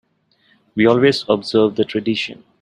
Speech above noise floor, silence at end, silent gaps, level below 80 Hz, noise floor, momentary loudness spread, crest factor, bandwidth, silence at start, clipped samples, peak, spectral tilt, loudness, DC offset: 43 dB; 0.3 s; none; -58 dBFS; -60 dBFS; 10 LU; 18 dB; 11 kHz; 0.75 s; under 0.1%; 0 dBFS; -6 dB/octave; -17 LUFS; under 0.1%